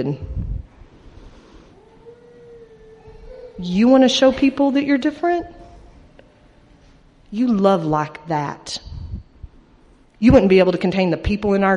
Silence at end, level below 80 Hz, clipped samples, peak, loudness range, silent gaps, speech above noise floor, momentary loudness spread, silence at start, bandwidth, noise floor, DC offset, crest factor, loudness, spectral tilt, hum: 0 s; -38 dBFS; under 0.1%; -2 dBFS; 6 LU; none; 34 dB; 21 LU; 0 s; 10 kHz; -51 dBFS; under 0.1%; 18 dB; -17 LUFS; -6 dB/octave; none